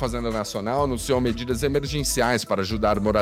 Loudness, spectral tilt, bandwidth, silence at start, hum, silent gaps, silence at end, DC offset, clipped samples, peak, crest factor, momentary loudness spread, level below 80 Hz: -24 LUFS; -4.5 dB/octave; 16.5 kHz; 0 s; none; none; 0 s; under 0.1%; under 0.1%; -8 dBFS; 16 dB; 5 LU; -36 dBFS